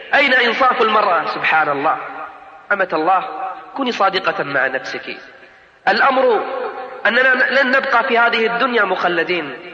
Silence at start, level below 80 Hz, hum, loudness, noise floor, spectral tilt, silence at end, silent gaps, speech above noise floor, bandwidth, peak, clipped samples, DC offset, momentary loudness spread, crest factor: 0 s; -64 dBFS; none; -16 LUFS; -45 dBFS; -4.5 dB/octave; 0 s; none; 29 dB; 7.8 kHz; -4 dBFS; under 0.1%; under 0.1%; 14 LU; 12 dB